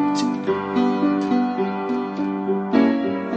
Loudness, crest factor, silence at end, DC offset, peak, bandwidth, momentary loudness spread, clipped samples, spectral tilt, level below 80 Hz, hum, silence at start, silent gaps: -21 LUFS; 16 dB; 0 s; under 0.1%; -6 dBFS; 8.6 kHz; 6 LU; under 0.1%; -6.5 dB/octave; -64 dBFS; none; 0 s; none